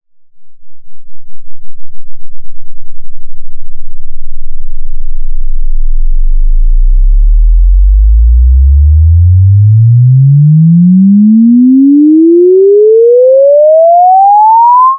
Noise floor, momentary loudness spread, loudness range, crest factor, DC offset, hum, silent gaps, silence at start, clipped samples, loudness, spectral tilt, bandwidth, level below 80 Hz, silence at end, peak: -24 dBFS; 16 LU; 17 LU; 4 dB; under 0.1%; none; none; 0.35 s; under 0.1%; -5 LUFS; -21.5 dB/octave; 1.2 kHz; -10 dBFS; 0 s; 0 dBFS